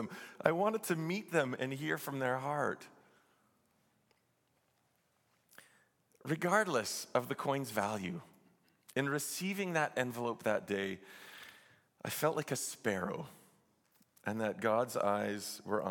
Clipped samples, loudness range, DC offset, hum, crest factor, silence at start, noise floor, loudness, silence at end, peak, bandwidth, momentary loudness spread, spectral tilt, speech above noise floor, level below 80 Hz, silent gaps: under 0.1%; 5 LU; under 0.1%; none; 28 dB; 0 s; -77 dBFS; -36 LUFS; 0 s; -10 dBFS; 17.5 kHz; 13 LU; -4.5 dB/octave; 41 dB; -84 dBFS; none